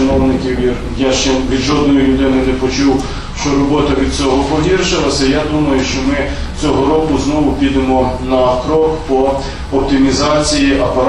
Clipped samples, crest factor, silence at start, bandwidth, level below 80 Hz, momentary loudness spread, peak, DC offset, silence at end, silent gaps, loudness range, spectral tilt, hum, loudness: under 0.1%; 10 dB; 0 s; 11 kHz; -24 dBFS; 5 LU; -2 dBFS; under 0.1%; 0 s; none; 1 LU; -5 dB/octave; none; -13 LUFS